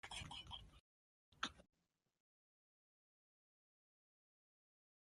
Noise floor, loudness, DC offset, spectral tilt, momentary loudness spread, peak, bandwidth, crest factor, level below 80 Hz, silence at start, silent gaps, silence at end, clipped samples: under -90 dBFS; -51 LUFS; under 0.1%; -2 dB/octave; 7 LU; -26 dBFS; 11.5 kHz; 34 dB; -74 dBFS; 0.05 s; 0.80-1.32 s; 3.4 s; under 0.1%